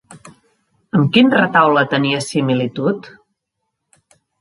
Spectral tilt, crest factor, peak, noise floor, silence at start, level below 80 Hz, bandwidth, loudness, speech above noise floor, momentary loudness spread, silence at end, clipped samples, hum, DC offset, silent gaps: -6 dB/octave; 18 dB; 0 dBFS; -76 dBFS; 0.1 s; -60 dBFS; 11.5 kHz; -15 LUFS; 61 dB; 9 LU; 1.3 s; under 0.1%; none; under 0.1%; none